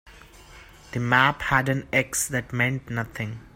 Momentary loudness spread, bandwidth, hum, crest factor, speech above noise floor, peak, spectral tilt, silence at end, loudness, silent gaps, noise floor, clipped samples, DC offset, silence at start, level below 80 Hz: 12 LU; 16.5 kHz; none; 22 dB; 23 dB; -4 dBFS; -4 dB/octave; 0.1 s; -24 LUFS; none; -48 dBFS; under 0.1%; under 0.1%; 0.05 s; -48 dBFS